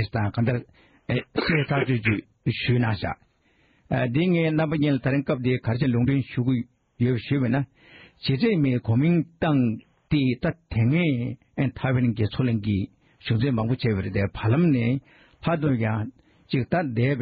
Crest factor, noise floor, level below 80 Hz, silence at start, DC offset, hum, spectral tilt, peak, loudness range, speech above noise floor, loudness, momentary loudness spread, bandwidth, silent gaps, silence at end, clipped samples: 16 dB; -63 dBFS; -50 dBFS; 0 s; under 0.1%; none; -6.5 dB/octave; -8 dBFS; 2 LU; 40 dB; -24 LUFS; 8 LU; 5 kHz; none; 0 s; under 0.1%